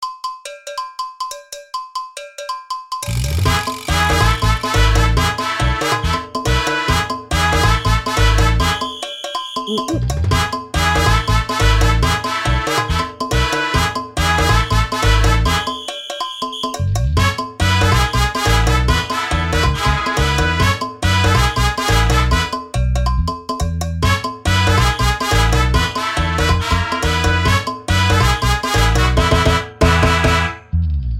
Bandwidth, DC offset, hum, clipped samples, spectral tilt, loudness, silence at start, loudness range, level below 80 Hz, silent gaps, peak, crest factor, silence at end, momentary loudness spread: 16.5 kHz; under 0.1%; none; under 0.1%; -4.5 dB/octave; -16 LUFS; 0 s; 2 LU; -22 dBFS; none; 0 dBFS; 16 dB; 0 s; 10 LU